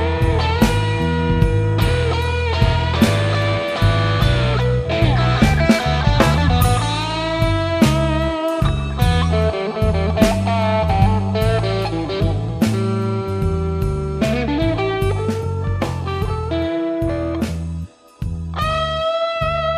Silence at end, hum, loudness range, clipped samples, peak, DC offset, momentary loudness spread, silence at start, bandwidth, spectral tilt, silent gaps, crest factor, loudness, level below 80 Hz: 0 s; none; 5 LU; under 0.1%; 0 dBFS; under 0.1%; 6 LU; 0 s; 15.5 kHz; -6.5 dB/octave; none; 16 dB; -18 LUFS; -26 dBFS